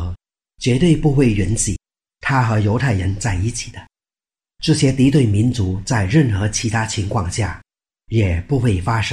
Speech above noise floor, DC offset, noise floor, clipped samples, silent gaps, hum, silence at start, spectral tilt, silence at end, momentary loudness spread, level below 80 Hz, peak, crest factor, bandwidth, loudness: over 74 dB; under 0.1%; under -90 dBFS; under 0.1%; none; none; 0 s; -5.5 dB/octave; 0 s; 10 LU; -34 dBFS; -2 dBFS; 14 dB; 11.5 kHz; -18 LUFS